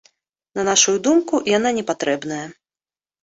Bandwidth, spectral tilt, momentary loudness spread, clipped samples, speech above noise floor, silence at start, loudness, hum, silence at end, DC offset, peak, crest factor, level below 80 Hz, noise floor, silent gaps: 8 kHz; -2.5 dB/octave; 15 LU; under 0.1%; over 71 dB; 0.55 s; -18 LUFS; none; 0.7 s; under 0.1%; -2 dBFS; 18 dB; -62 dBFS; under -90 dBFS; none